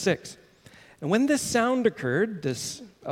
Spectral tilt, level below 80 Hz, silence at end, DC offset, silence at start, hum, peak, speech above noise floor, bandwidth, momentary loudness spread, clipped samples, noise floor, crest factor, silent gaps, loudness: -4.5 dB/octave; -62 dBFS; 0 s; under 0.1%; 0 s; none; -10 dBFS; 27 dB; 16.5 kHz; 13 LU; under 0.1%; -53 dBFS; 18 dB; none; -26 LUFS